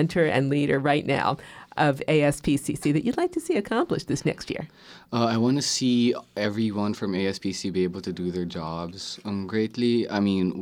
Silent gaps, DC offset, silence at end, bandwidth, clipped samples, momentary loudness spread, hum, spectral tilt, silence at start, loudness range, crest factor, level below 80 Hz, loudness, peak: none; under 0.1%; 0 s; 16.5 kHz; under 0.1%; 10 LU; none; -5.5 dB/octave; 0 s; 4 LU; 16 dB; -54 dBFS; -25 LUFS; -8 dBFS